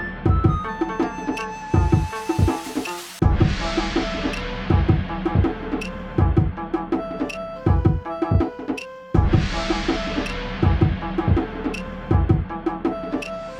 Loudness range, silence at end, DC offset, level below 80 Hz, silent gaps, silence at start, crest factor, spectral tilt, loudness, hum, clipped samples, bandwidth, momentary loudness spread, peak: 1 LU; 0 s; under 0.1%; -28 dBFS; none; 0 s; 18 dB; -7 dB/octave; -23 LUFS; none; under 0.1%; 13.5 kHz; 9 LU; -4 dBFS